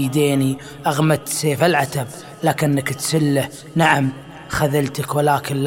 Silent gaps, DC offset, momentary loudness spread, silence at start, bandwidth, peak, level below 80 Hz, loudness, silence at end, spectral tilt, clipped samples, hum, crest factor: none; under 0.1%; 8 LU; 0 s; 16.5 kHz; 0 dBFS; -50 dBFS; -19 LUFS; 0 s; -5 dB/octave; under 0.1%; none; 18 dB